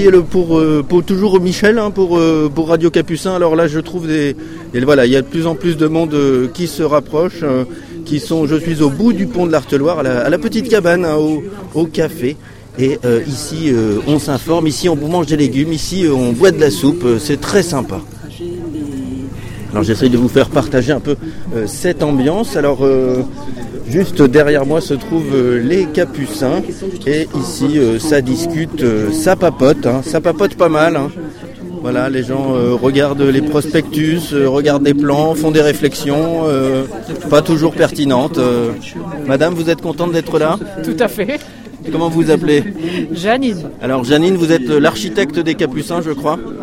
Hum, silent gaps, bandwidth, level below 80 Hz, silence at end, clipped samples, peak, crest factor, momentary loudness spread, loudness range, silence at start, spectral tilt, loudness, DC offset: none; none; 16.5 kHz; -38 dBFS; 0 s; under 0.1%; 0 dBFS; 14 dB; 10 LU; 3 LU; 0 s; -6 dB/octave; -14 LUFS; under 0.1%